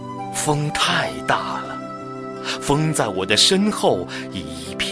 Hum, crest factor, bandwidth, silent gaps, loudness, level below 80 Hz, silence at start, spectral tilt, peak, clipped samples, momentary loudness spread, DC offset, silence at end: none; 20 dB; 11 kHz; none; -20 LUFS; -48 dBFS; 0 s; -3.5 dB/octave; 0 dBFS; under 0.1%; 15 LU; under 0.1%; 0 s